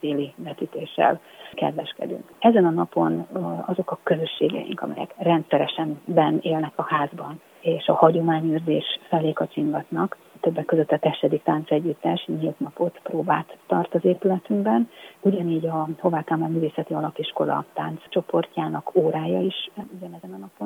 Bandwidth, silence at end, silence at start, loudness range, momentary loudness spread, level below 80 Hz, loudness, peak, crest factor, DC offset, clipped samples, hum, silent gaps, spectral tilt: 16 kHz; 0 s; 0.05 s; 3 LU; 10 LU; -74 dBFS; -24 LUFS; 0 dBFS; 22 dB; under 0.1%; under 0.1%; none; none; -8 dB/octave